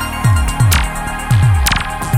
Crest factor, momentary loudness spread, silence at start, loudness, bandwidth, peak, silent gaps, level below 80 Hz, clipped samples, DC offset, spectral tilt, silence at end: 12 dB; 6 LU; 0 s; -14 LUFS; 17 kHz; 0 dBFS; none; -20 dBFS; under 0.1%; under 0.1%; -4.5 dB/octave; 0 s